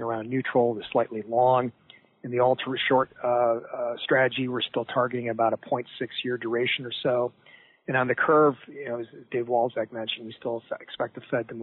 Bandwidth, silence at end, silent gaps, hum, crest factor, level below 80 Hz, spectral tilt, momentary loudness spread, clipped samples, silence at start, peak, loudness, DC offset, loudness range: 4.3 kHz; 0 s; none; none; 16 dB; -74 dBFS; -3 dB/octave; 11 LU; under 0.1%; 0 s; -10 dBFS; -26 LUFS; under 0.1%; 3 LU